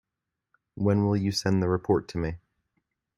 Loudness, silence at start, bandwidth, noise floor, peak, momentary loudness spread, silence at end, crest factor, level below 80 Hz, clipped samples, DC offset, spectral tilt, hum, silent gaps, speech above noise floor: -27 LUFS; 0.75 s; 13 kHz; -86 dBFS; -10 dBFS; 9 LU; 0.8 s; 18 dB; -54 dBFS; under 0.1%; under 0.1%; -6.5 dB/octave; none; none; 61 dB